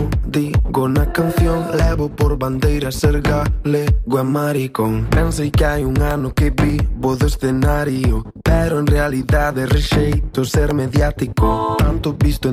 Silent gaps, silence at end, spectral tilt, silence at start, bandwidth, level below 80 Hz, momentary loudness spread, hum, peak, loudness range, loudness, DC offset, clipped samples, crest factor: none; 0 s; -6.5 dB/octave; 0 s; 15.5 kHz; -22 dBFS; 3 LU; none; -2 dBFS; 1 LU; -17 LUFS; under 0.1%; under 0.1%; 14 dB